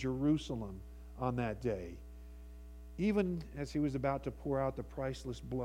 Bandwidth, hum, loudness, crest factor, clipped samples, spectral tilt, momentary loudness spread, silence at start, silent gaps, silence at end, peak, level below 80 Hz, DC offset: 15.5 kHz; none; -37 LUFS; 18 dB; under 0.1%; -7.5 dB/octave; 20 LU; 0 s; none; 0 s; -20 dBFS; -50 dBFS; under 0.1%